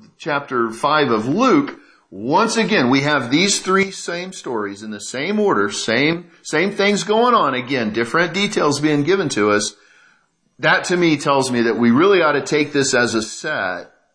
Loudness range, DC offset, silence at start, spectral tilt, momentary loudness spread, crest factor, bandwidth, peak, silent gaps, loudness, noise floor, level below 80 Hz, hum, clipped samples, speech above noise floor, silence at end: 2 LU; under 0.1%; 0.2 s; -4 dB/octave; 10 LU; 16 dB; 11 kHz; -2 dBFS; none; -17 LUFS; -60 dBFS; -62 dBFS; none; under 0.1%; 42 dB; 0.3 s